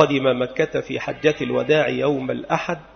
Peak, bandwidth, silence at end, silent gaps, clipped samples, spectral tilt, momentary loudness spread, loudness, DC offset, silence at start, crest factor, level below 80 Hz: 0 dBFS; 6.6 kHz; 0.1 s; none; under 0.1%; -6 dB/octave; 6 LU; -21 LUFS; under 0.1%; 0 s; 20 dB; -54 dBFS